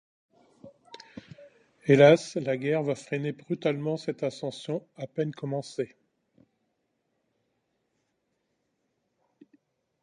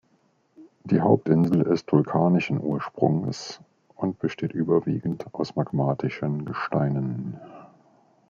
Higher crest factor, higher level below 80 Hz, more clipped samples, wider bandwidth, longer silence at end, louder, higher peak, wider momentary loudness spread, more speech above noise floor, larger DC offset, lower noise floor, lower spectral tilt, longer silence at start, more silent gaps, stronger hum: about the same, 26 dB vs 22 dB; second, -74 dBFS vs -62 dBFS; neither; first, 10.5 kHz vs 7.4 kHz; first, 4.15 s vs 0.65 s; about the same, -27 LUFS vs -25 LUFS; about the same, -4 dBFS vs -4 dBFS; first, 19 LU vs 12 LU; first, 51 dB vs 42 dB; neither; first, -77 dBFS vs -65 dBFS; second, -6.5 dB/octave vs -8 dB/octave; about the same, 0.65 s vs 0.6 s; neither; neither